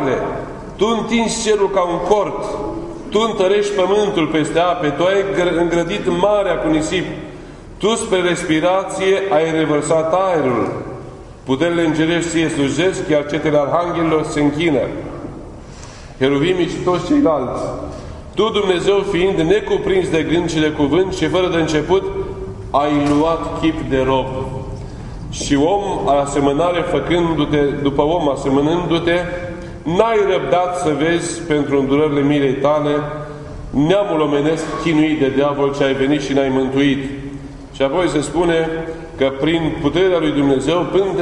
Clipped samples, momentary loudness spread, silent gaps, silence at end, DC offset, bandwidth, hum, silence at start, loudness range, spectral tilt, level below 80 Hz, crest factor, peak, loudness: under 0.1%; 12 LU; none; 0 s; under 0.1%; 11 kHz; none; 0 s; 2 LU; -5.5 dB/octave; -38 dBFS; 16 dB; 0 dBFS; -17 LUFS